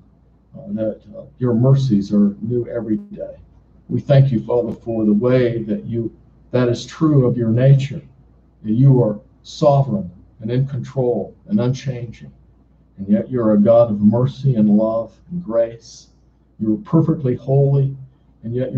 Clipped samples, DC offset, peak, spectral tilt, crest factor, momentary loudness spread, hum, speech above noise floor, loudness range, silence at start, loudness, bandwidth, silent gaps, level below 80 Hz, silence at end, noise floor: under 0.1%; under 0.1%; -2 dBFS; -9 dB/octave; 16 dB; 17 LU; none; 35 dB; 4 LU; 0.55 s; -18 LUFS; 7.2 kHz; none; -50 dBFS; 0 s; -52 dBFS